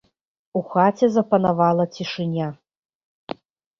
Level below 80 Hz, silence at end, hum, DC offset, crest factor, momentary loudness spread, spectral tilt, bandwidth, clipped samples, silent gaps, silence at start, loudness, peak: -62 dBFS; 1.25 s; none; under 0.1%; 18 dB; 19 LU; -7.5 dB/octave; 7.2 kHz; under 0.1%; none; 0.55 s; -21 LUFS; -4 dBFS